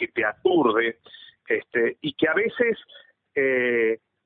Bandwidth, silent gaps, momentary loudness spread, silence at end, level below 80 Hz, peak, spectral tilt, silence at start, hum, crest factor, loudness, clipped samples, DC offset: 4.2 kHz; none; 7 LU; 0.3 s; -68 dBFS; -8 dBFS; -9.5 dB/octave; 0 s; none; 16 dB; -23 LUFS; under 0.1%; under 0.1%